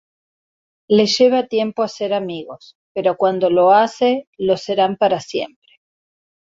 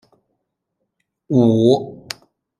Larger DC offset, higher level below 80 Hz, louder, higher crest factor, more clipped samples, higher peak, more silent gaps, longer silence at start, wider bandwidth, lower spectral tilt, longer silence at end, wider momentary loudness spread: neither; about the same, -64 dBFS vs -60 dBFS; about the same, -17 LUFS vs -16 LUFS; about the same, 16 dB vs 18 dB; neither; about the same, -2 dBFS vs -2 dBFS; first, 2.75-2.95 s, 4.27-4.33 s vs none; second, 0.9 s vs 1.3 s; second, 7.8 kHz vs 12 kHz; second, -5 dB/octave vs -7.5 dB/octave; first, 1.05 s vs 0.65 s; second, 13 LU vs 19 LU